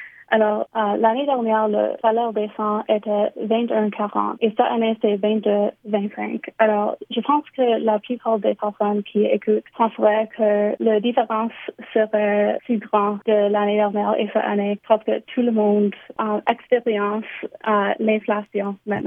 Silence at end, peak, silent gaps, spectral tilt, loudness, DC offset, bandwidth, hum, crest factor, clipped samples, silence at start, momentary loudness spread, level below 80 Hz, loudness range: 0 s; -2 dBFS; none; -9 dB/octave; -21 LUFS; under 0.1%; 3.7 kHz; none; 18 dB; under 0.1%; 0 s; 6 LU; -74 dBFS; 1 LU